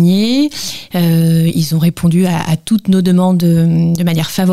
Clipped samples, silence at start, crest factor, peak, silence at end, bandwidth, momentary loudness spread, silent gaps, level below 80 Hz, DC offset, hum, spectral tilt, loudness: under 0.1%; 0 s; 12 dB; 0 dBFS; 0 s; 15 kHz; 5 LU; none; -44 dBFS; 1%; none; -6.5 dB/octave; -13 LUFS